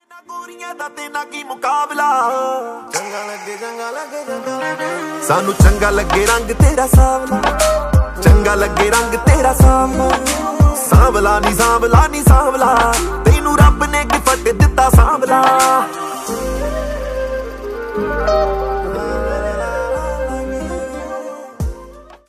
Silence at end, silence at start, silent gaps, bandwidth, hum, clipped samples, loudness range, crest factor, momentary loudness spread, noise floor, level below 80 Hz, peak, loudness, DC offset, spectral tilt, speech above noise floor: 0.25 s; 0.15 s; none; 15.5 kHz; none; under 0.1%; 8 LU; 14 dB; 15 LU; -37 dBFS; -20 dBFS; 0 dBFS; -14 LUFS; under 0.1%; -5 dB/octave; 24 dB